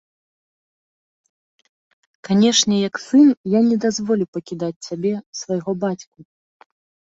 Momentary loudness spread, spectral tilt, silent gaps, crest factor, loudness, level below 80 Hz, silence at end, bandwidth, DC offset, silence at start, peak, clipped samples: 13 LU; -4.5 dB/octave; 3.37-3.44 s, 4.28-4.33 s, 4.76-4.81 s, 5.26-5.33 s; 20 dB; -19 LUFS; -64 dBFS; 1.1 s; 8 kHz; under 0.1%; 2.25 s; -2 dBFS; under 0.1%